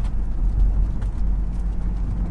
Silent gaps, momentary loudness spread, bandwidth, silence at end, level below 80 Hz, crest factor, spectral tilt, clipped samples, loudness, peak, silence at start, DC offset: none; 5 LU; 2.6 kHz; 0 s; -22 dBFS; 10 dB; -9 dB/octave; under 0.1%; -26 LUFS; -10 dBFS; 0 s; under 0.1%